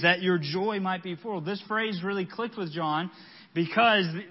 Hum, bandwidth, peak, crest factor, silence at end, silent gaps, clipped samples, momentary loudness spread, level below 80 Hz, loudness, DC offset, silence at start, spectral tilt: none; 5.8 kHz; -8 dBFS; 20 dB; 0 s; none; under 0.1%; 11 LU; -78 dBFS; -28 LUFS; under 0.1%; 0 s; -9 dB/octave